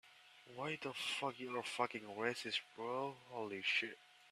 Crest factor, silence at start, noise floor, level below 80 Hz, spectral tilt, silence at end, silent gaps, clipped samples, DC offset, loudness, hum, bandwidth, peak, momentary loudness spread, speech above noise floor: 22 dB; 0.05 s; -63 dBFS; -88 dBFS; -3 dB/octave; 0 s; none; under 0.1%; under 0.1%; -42 LUFS; none; 14 kHz; -22 dBFS; 12 LU; 20 dB